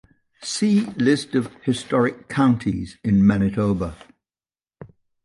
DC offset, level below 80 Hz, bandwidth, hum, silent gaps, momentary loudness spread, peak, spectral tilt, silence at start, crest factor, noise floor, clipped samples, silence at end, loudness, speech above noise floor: under 0.1%; -46 dBFS; 11.5 kHz; none; none; 9 LU; -6 dBFS; -6 dB/octave; 0.4 s; 16 dB; under -90 dBFS; under 0.1%; 0.4 s; -21 LUFS; over 70 dB